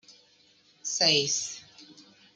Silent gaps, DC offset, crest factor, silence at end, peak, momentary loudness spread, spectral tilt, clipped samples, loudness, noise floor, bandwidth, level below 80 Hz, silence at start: none; under 0.1%; 24 dB; 0.35 s; -8 dBFS; 17 LU; -1 dB/octave; under 0.1%; -25 LUFS; -62 dBFS; 11.5 kHz; -78 dBFS; 0.1 s